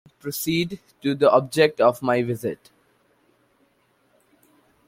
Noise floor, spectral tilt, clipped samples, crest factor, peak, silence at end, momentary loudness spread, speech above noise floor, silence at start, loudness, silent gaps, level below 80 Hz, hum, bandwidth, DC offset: -64 dBFS; -5 dB/octave; under 0.1%; 22 dB; -4 dBFS; 2.3 s; 13 LU; 43 dB; 0.25 s; -22 LUFS; none; -64 dBFS; none; 16.5 kHz; under 0.1%